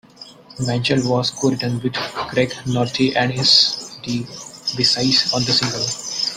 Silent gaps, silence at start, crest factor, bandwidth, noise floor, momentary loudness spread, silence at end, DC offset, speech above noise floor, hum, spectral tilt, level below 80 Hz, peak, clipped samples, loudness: none; 0.2 s; 18 dB; 15.5 kHz; -42 dBFS; 13 LU; 0 s; under 0.1%; 23 dB; none; -3.5 dB/octave; -54 dBFS; 0 dBFS; under 0.1%; -18 LUFS